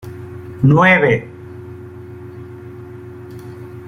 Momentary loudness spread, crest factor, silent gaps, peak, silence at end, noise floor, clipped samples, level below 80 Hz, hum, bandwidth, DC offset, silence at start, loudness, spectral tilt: 24 LU; 18 dB; none; -2 dBFS; 0 s; -33 dBFS; under 0.1%; -50 dBFS; none; 6.8 kHz; under 0.1%; 0.05 s; -13 LUFS; -8 dB/octave